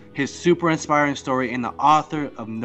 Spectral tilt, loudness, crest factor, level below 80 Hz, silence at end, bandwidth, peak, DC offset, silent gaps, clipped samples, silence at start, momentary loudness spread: -5 dB/octave; -21 LUFS; 16 dB; -56 dBFS; 0 s; 8.4 kHz; -6 dBFS; under 0.1%; none; under 0.1%; 0 s; 10 LU